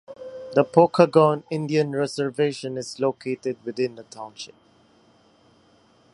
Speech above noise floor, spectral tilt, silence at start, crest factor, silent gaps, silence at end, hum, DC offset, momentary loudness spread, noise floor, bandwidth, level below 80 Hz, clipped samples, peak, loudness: 36 dB; -6.5 dB/octave; 0.1 s; 24 dB; none; 1.65 s; none; under 0.1%; 22 LU; -58 dBFS; 11.5 kHz; -70 dBFS; under 0.1%; 0 dBFS; -22 LUFS